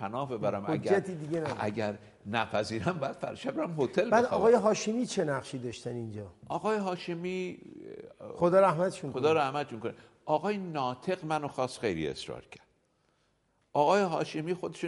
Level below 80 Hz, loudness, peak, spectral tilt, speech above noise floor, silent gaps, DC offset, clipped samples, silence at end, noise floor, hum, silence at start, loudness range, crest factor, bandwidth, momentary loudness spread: -66 dBFS; -31 LUFS; -12 dBFS; -5.5 dB/octave; 43 dB; none; under 0.1%; under 0.1%; 0 s; -73 dBFS; none; 0 s; 5 LU; 18 dB; 11.5 kHz; 15 LU